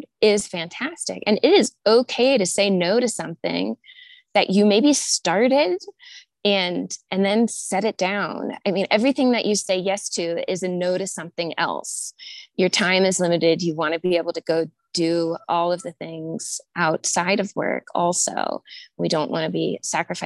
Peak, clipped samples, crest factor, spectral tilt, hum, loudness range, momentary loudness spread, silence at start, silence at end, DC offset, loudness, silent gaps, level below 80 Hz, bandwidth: -4 dBFS; under 0.1%; 18 dB; -3.5 dB/octave; none; 4 LU; 11 LU; 0 s; 0 s; under 0.1%; -21 LUFS; none; -68 dBFS; 12.5 kHz